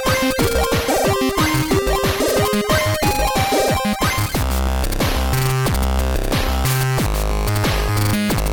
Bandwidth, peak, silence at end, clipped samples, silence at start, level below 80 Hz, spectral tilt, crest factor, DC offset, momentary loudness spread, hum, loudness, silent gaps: over 20 kHz; -6 dBFS; 0 s; under 0.1%; 0 s; -24 dBFS; -4.5 dB/octave; 12 dB; under 0.1%; 3 LU; none; -18 LUFS; none